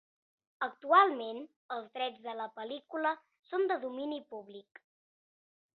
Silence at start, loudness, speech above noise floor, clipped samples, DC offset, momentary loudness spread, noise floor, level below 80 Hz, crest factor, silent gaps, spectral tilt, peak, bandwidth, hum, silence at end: 0.6 s; -33 LUFS; over 56 dB; under 0.1%; under 0.1%; 20 LU; under -90 dBFS; -88 dBFS; 24 dB; 1.56-1.69 s, 3.39-3.43 s; 0 dB/octave; -10 dBFS; 4.6 kHz; none; 1.15 s